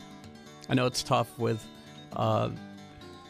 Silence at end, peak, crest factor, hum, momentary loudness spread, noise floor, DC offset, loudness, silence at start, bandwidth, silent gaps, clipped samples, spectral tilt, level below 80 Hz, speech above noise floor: 0 s; -12 dBFS; 20 dB; none; 20 LU; -48 dBFS; under 0.1%; -30 LUFS; 0 s; 15.5 kHz; none; under 0.1%; -5.5 dB/octave; -60 dBFS; 20 dB